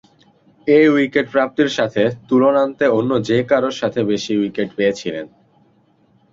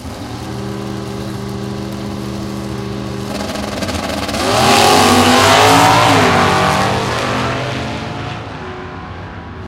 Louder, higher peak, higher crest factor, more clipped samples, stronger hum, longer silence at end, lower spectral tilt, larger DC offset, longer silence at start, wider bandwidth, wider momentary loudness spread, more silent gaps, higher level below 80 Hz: second, -17 LUFS vs -14 LUFS; about the same, -2 dBFS vs 0 dBFS; about the same, 16 dB vs 14 dB; neither; neither; first, 1.05 s vs 0 s; first, -6 dB/octave vs -4 dB/octave; neither; first, 0.65 s vs 0 s; second, 7.8 kHz vs 17.5 kHz; second, 9 LU vs 18 LU; neither; second, -58 dBFS vs -36 dBFS